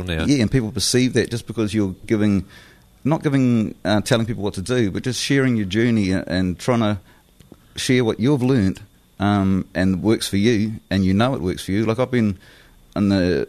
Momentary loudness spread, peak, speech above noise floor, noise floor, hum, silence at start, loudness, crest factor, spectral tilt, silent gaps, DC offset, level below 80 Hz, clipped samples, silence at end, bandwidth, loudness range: 6 LU; -4 dBFS; 29 dB; -48 dBFS; none; 0 s; -20 LUFS; 16 dB; -5.5 dB/octave; none; under 0.1%; -44 dBFS; under 0.1%; 0 s; 13.5 kHz; 1 LU